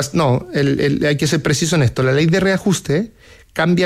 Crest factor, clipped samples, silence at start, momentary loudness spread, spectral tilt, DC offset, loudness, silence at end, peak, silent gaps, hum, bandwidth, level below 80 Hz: 12 dB; under 0.1%; 0 s; 6 LU; -5.5 dB/octave; under 0.1%; -16 LUFS; 0 s; -6 dBFS; none; none; 15.5 kHz; -44 dBFS